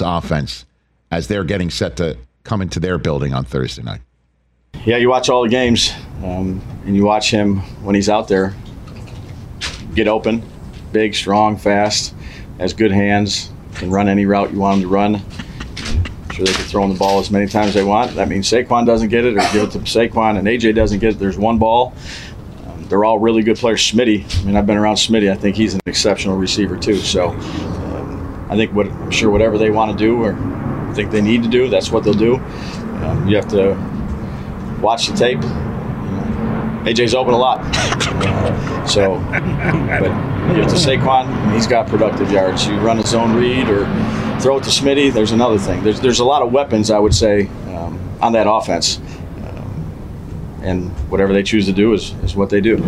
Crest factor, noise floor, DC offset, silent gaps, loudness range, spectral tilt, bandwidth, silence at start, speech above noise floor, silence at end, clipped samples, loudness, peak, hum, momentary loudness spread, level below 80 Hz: 14 dB; -59 dBFS; under 0.1%; none; 5 LU; -5 dB/octave; 13 kHz; 0 s; 45 dB; 0 s; under 0.1%; -16 LUFS; -2 dBFS; none; 13 LU; -32 dBFS